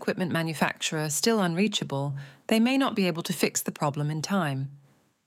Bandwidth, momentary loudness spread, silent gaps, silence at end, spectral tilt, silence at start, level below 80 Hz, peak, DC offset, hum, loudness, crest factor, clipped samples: 16.5 kHz; 8 LU; none; 0.5 s; -4.5 dB/octave; 0 s; -74 dBFS; -10 dBFS; under 0.1%; none; -27 LUFS; 18 dB; under 0.1%